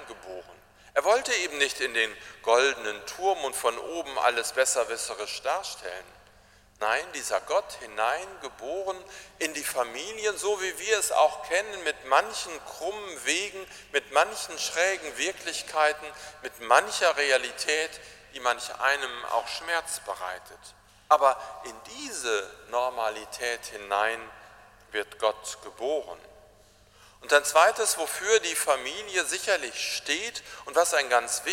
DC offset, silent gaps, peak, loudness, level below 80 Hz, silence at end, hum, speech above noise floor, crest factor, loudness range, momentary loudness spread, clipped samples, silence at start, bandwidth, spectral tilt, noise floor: under 0.1%; none; -4 dBFS; -27 LUFS; -64 dBFS; 0 s; none; 29 dB; 24 dB; 6 LU; 15 LU; under 0.1%; 0 s; 16.5 kHz; 0 dB/octave; -57 dBFS